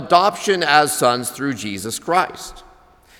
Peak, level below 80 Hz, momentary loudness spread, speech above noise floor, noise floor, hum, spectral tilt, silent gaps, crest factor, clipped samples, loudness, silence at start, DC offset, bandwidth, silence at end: 0 dBFS; -52 dBFS; 11 LU; 31 dB; -49 dBFS; none; -3 dB/octave; none; 20 dB; under 0.1%; -18 LUFS; 0 s; under 0.1%; 20 kHz; 0.6 s